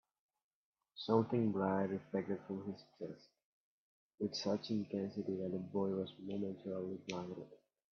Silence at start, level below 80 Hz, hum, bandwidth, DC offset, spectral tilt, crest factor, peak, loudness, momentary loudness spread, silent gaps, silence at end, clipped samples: 0.95 s; -82 dBFS; none; 6.8 kHz; under 0.1%; -6 dB/octave; 22 dB; -18 dBFS; -40 LUFS; 15 LU; 3.45-4.18 s; 0.4 s; under 0.1%